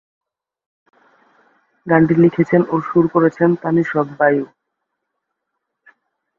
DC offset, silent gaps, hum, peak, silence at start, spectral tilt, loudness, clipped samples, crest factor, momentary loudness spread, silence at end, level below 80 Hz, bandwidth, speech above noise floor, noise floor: under 0.1%; none; none; -2 dBFS; 1.85 s; -10 dB/octave; -16 LUFS; under 0.1%; 16 dB; 7 LU; 1.95 s; -58 dBFS; 6.6 kHz; 62 dB; -77 dBFS